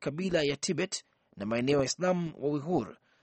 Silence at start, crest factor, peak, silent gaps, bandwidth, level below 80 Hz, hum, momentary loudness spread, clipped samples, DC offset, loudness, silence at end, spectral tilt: 0 s; 18 dB; -14 dBFS; none; 8.8 kHz; -62 dBFS; none; 8 LU; under 0.1%; under 0.1%; -31 LUFS; 0.3 s; -4.5 dB/octave